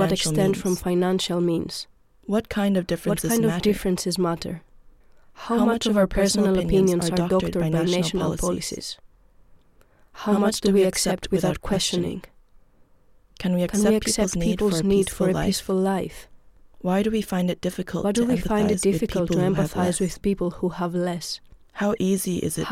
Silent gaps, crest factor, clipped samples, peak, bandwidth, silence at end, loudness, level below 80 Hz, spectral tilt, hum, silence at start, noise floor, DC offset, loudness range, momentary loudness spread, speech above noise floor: none; 14 dB; under 0.1%; -8 dBFS; 16 kHz; 0 s; -23 LUFS; -42 dBFS; -5 dB/octave; none; 0 s; -55 dBFS; under 0.1%; 3 LU; 10 LU; 33 dB